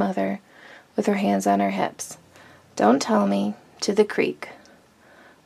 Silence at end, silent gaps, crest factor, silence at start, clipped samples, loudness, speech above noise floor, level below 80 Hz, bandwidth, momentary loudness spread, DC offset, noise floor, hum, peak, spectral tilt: 0.9 s; none; 20 dB; 0 s; under 0.1%; -23 LUFS; 31 dB; -72 dBFS; 14.5 kHz; 16 LU; under 0.1%; -53 dBFS; none; -4 dBFS; -5.5 dB/octave